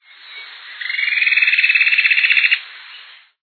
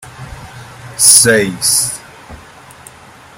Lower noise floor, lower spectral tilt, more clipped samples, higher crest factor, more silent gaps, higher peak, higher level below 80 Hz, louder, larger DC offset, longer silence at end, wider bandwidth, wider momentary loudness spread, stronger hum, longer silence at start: about the same, -41 dBFS vs -39 dBFS; second, 7 dB/octave vs -1.5 dB/octave; second, under 0.1% vs 0.5%; about the same, 16 dB vs 16 dB; neither; about the same, 0 dBFS vs 0 dBFS; second, under -90 dBFS vs -44 dBFS; second, -13 LUFS vs -8 LUFS; neither; second, 0.4 s vs 1 s; second, 4.6 kHz vs over 20 kHz; second, 22 LU vs 26 LU; neither; first, 0.25 s vs 0 s